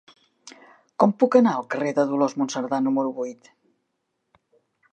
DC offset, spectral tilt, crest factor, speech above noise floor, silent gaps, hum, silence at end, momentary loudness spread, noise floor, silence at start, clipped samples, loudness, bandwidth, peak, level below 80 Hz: under 0.1%; -6 dB/octave; 22 dB; 55 dB; none; none; 1.6 s; 12 LU; -76 dBFS; 0.45 s; under 0.1%; -22 LUFS; 9 kHz; -2 dBFS; -80 dBFS